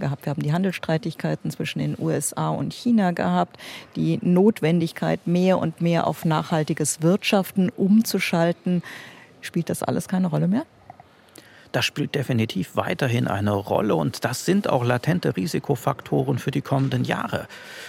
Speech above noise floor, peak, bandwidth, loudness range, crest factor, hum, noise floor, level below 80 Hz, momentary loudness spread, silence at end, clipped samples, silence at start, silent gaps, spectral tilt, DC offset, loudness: 27 dB; -6 dBFS; 16.5 kHz; 4 LU; 18 dB; none; -49 dBFS; -64 dBFS; 8 LU; 0 s; under 0.1%; 0 s; none; -6 dB/octave; under 0.1%; -23 LUFS